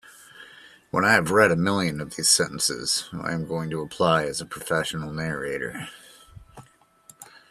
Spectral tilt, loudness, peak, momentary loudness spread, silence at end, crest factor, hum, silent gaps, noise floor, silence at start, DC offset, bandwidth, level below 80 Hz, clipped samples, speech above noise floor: -3 dB/octave; -23 LUFS; -2 dBFS; 12 LU; 0.15 s; 24 dB; none; none; -55 dBFS; 0.05 s; under 0.1%; 14.5 kHz; -56 dBFS; under 0.1%; 31 dB